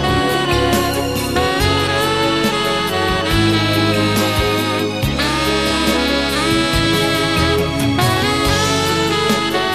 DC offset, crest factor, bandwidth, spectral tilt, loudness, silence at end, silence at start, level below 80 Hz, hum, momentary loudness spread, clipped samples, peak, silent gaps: 0.5%; 14 dB; 15 kHz; -4.5 dB/octave; -15 LUFS; 0 s; 0 s; -30 dBFS; none; 2 LU; under 0.1%; -2 dBFS; none